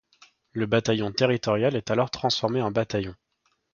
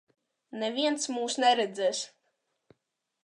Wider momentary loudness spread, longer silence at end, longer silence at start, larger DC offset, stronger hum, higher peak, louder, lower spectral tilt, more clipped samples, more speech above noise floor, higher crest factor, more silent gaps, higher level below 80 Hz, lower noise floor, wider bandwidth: second, 8 LU vs 12 LU; second, 0.6 s vs 1.2 s; about the same, 0.55 s vs 0.5 s; neither; neither; first, -6 dBFS vs -10 dBFS; first, -25 LUFS vs -28 LUFS; first, -5.5 dB/octave vs -1.5 dB/octave; neither; second, 34 dB vs 52 dB; about the same, 20 dB vs 20 dB; neither; first, -56 dBFS vs -88 dBFS; second, -59 dBFS vs -80 dBFS; second, 7.2 kHz vs 11 kHz